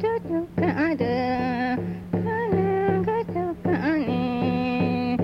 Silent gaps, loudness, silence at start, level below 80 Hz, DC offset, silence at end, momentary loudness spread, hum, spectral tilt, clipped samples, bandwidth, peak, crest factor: none; -25 LUFS; 0 s; -52 dBFS; under 0.1%; 0 s; 4 LU; none; -9 dB/octave; under 0.1%; 6 kHz; -10 dBFS; 14 dB